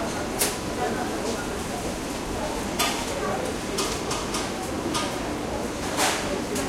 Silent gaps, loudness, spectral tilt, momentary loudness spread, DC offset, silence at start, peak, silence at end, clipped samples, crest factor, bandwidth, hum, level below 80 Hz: none; -27 LUFS; -3 dB/octave; 5 LU; under 0.1%; 0 s; -4 dBFS; 0 s; under 0.1%; 24 dB; 16.5 kHz; none; -42 dBFS